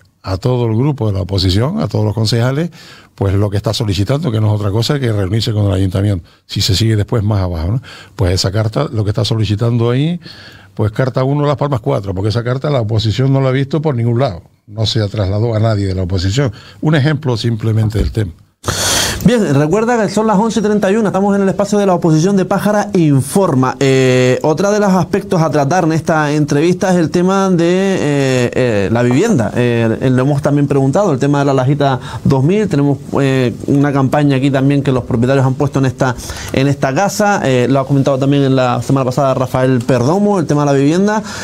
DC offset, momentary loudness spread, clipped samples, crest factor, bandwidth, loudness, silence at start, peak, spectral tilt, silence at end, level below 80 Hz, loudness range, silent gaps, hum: under 0.1%; 5 LU; under 0.1%; 12 dB; 16 kHz; -14 LUFS; 0.25 s; 0 dBFS; -6 dB/octave; 0 s; -38 dBFS; 3 LU; none; none